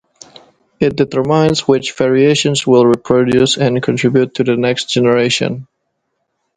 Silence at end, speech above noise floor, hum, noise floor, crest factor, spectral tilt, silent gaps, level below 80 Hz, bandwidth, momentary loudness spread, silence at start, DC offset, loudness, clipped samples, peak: 0.95 s; 57 dB; none; -69 dBFS; 14 dB; -5 dB/octave; none; -48 dBFS; 9.6 kHz; 5 LU; 0.8 s; under 0.1%; -13 LUFS; under 0.1%; 0 dBFS